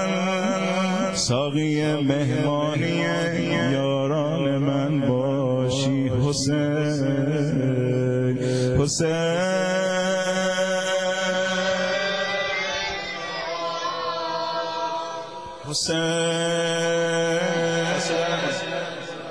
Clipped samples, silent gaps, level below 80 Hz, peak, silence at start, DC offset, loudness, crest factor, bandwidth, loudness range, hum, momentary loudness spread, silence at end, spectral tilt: under 0.1%; none; -54 dBFS; -6 dBFS; 0 s; 0.3%; -23 LUFS; 16 dB; 11 kHz; 3 LU; none; 5 LU; 0 s; -5 dB/octave